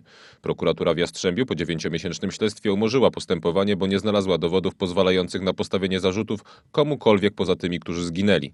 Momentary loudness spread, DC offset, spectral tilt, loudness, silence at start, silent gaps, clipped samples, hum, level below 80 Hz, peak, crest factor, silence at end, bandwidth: 8 LU; under 0.1%; -5.5 dB/octave; -23 LUFS; 0.45 s; none; under 0.1%; none; -58 dBFS; -2 dBFS; 20 dB; 0.05 s; 11.5 kHz